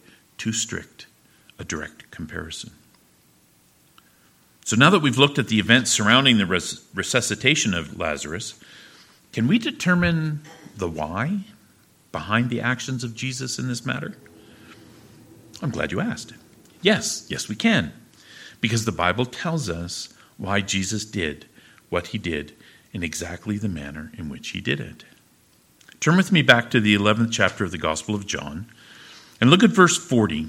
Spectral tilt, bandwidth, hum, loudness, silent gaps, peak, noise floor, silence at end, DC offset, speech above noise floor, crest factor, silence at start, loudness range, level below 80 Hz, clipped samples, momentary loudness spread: -4 dB/octave; 16 kHz; none; -22 LUFS; none; 0 dBFS; -58 dBFS; 0 s; under 0.1%; 36 dB; 24 dB; 0.4 s; 12 LU; -52 dBFS; under 0.1%; 19 LU